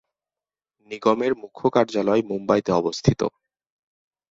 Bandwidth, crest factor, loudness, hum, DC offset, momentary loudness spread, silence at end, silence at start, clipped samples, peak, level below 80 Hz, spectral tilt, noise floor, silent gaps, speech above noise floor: 7.8 kHz; 22 dB; -22 LUFS; none; under 0.1%; 6 LU; 1 s; 0.9 s; under 0.1%; -2 dBFS; -52 dBFS; -6.5 dB/octave; under -90 dBFS; none; over 68 dB